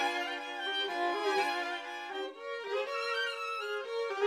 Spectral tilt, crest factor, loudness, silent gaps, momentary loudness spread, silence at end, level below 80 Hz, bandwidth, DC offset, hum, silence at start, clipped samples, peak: -0.5 dB/octave; 16 dB; -34 LUFS; none; 9 LU; 0 s; under -90 dBFS; 15.5 kHz; under 0.1%; none; 0 s; under 0.1%; -18 dBFS